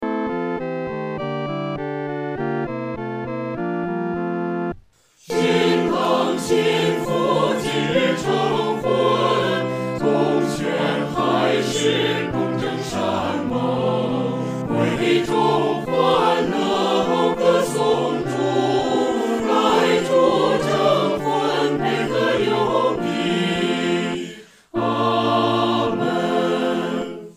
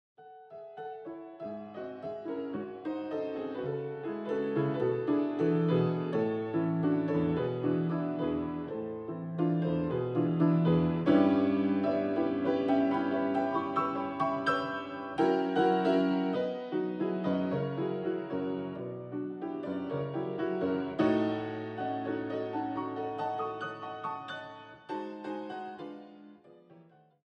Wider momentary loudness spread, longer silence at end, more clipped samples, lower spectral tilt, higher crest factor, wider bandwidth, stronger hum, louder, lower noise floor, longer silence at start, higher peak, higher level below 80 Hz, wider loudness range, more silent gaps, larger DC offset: second, 8 LU vs 13 LU; second, 0.05 s vs 0.45 s; neither; second, -5.5 dB/octave vs -9 dB/octave; about the same, 16 dB vs 18 dB; first, 15.5 kHz vs 6.4 kHz; neither; first, -20 LUFS vs -32 LUFS; second, -52 dBFS vs -59 dBFS; second, 0 s vs 0.2 s; first, -4 dBFS vs -14 dBFS; first, -54 dBFS vs -66 dBFS; second, 7 LU vs 10 LU; neither; neither